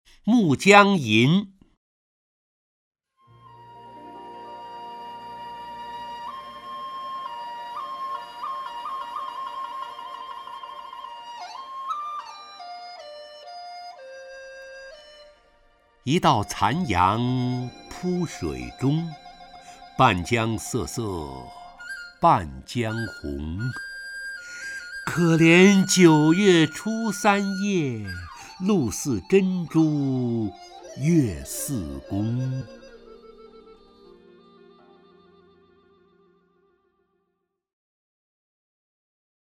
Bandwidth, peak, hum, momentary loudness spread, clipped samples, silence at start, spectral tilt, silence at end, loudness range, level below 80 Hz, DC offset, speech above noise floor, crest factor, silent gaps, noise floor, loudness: 16 kHz; 0 dBFS; none; 23 LU; under 0.1%; 0.25 s; -5.5 dB/octave; 5.85 s; 19 LU; -52 dBFS; under 0.1%; 57 dB; 26 dB; 1.77-2.91 s; -78 dBFS; -23 LUFS